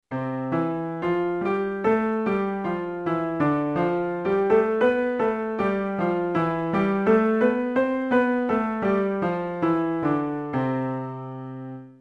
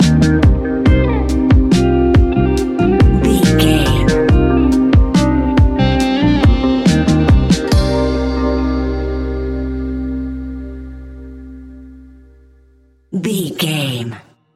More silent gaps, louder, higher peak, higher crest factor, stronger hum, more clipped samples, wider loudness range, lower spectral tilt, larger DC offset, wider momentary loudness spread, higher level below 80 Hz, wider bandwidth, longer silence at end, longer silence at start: neither; second, -24 LUFS vs -14 LUFS; second, -8 dBFS vs 0 dBFS; about the same, 14 dB vs 14 dB; neither; neither; second, 3 LU vs 14 LU; first, -9 dB/octave vs -6.5 dB/octave; neither; second, 8 LU vs 14 LU; second, -56 dBFS vs -20 dBFS; second, 7.6 kHz vs 14.5 kHz; second, 0.1 s vs 0.35 s; about the same, 0.1 s vs 0 s